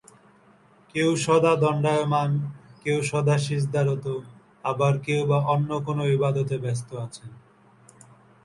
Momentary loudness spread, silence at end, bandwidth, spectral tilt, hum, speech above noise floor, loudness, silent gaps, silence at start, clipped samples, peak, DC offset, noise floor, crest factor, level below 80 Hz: 13 LU; 1.1 s; 11.5 kHz; -6.5 dB/octave; none; 33 dB; -24 LUFS; none; 0.95 s; under 0.1%; -8 dBFS; under 0.1%; -56 dBFS; 18 dB; -62 dBFS